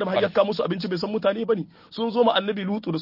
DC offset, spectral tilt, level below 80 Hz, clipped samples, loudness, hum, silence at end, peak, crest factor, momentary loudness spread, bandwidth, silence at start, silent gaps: under 0.1%; -7.5 dB/octave; -66 dBFS; under 0.1%; -24 LUFS; none; 0 s; -8 dBFS; 16 dB; 7 LU; 5.8 kHz; 0 s; none